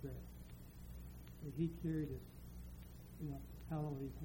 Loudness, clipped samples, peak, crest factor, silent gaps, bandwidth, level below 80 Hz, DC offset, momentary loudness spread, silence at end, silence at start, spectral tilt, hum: -48 LUFS; under 0.1%; -28 dBFS; 18 dB; none; 16.5 kHz; -56 dBFS; under 0.1%; 14 LU; 0 s; 0 s; -8 dB/octave; 60 Hz at -60 dBFS